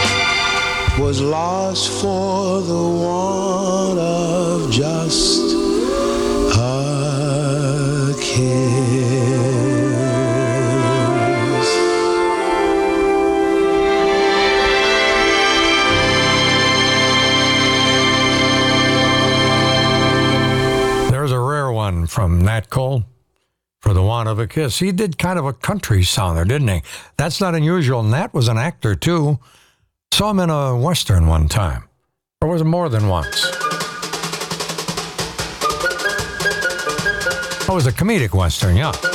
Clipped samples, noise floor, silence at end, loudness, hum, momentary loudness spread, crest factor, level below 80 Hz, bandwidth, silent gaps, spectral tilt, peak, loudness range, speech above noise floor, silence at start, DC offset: under 0.1%; -70 dBFS; 0 s; -16 LUFS; none; 7 LU; 10 dB; -34 dBFS; 18 kHz; none; -4.5 dB/octave; -6 dBFS; 7 LU; 53 dB; 0 s; under 0.1%